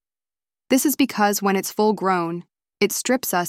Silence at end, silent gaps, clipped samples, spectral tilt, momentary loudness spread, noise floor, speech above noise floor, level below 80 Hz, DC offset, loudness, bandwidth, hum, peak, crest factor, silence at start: 0 s; none; under 0.1%; -3.5 dB/octave; 5 LU; under -90 dBFS; over 70 dB; -66 dBFS; under 0.1%; -21 LUFS; 16.5 kHz; none; -4 dBFS; 18 dB; 0.7 s